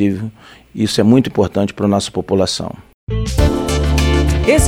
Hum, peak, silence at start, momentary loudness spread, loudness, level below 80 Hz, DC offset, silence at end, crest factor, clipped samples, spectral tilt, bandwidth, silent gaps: none; 0 dBFS; 0 s; 13 LU; -16 LUFS; -22 dBFS; under 0.1%; 0 s; 14 dB; under 0.1%; -5.5 dB/octave; 16 kHz; 2.94-3.07 s